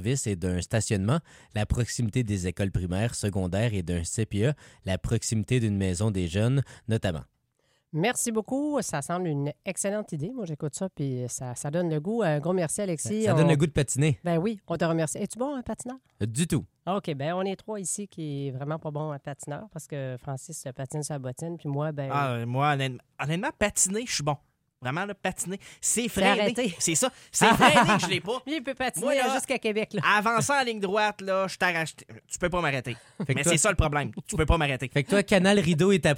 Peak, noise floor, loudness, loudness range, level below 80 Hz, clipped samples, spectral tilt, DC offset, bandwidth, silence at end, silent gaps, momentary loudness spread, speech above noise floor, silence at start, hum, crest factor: -4 dBFS; -71 dBFS; -27 LUFS; 8 LU; -44 dBFS; under 0.1%; -4.5 dB/octave; under 0.1%; 16 kHz; 0 s; none; 12 LU; 44 dB; 0 s; none; 22 dB